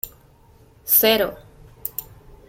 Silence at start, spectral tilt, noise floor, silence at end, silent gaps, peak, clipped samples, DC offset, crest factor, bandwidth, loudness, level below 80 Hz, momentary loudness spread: 0.05 s; -2 dB/octave; -52 dBFS; 0.45 s; none; -2 dBFS; under 0.1%; under 0.1%; 22 dB; 17 kHz; -18 LUFS; -50 dBFS; 19 LU